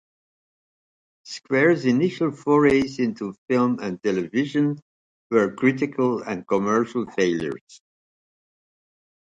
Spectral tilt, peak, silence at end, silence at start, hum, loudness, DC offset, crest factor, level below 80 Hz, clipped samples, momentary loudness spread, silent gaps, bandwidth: -6.5 dB/octave; -6 dBFS; 1.6 s; 1.25 s; none; -22 LUFS; under 0.1%; 18 dB; -60 dBFS; under 0.1%; 10 LU; 3.38-3.48 s, 4.82-5.30 s, 7.61-7.67 s; 9 kHz